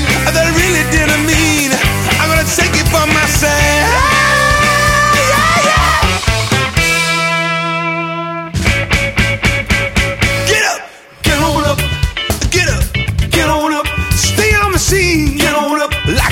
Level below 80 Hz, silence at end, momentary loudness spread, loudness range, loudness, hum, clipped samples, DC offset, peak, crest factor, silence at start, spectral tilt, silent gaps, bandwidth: -22 dBFS; 0 s; 6 LU; 4 LU; -11 LUFS; none; under 0.1%; under 0.1%; 0 dBFS; 12 dB; 0 s; -3.5 dB/octave; none; 17.5 kHz